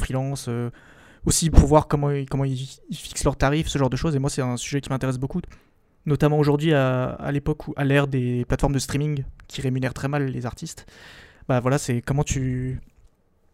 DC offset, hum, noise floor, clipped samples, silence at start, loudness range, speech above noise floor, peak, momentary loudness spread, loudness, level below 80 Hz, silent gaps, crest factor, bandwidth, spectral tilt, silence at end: under 0.1%; none; -57 dBFS; under 0.1%; 0 s; 5 LU; 35 dB; 0 dBFS; 13 LU; -23 LUFS; -32 dBFS; none; 22 dB; 15.5 kHz; -5.5 dB/octave; 0.7 s